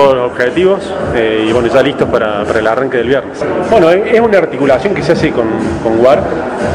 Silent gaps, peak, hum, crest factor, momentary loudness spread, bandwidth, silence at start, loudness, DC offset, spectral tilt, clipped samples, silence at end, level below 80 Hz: none; 0 dBFS; none; 10 dB; 6 LU; 11 kHz; 0 s; -11 LUFS; under 0.1%; -6.5 dB/octave; 1%; 0 s; -36 dBFS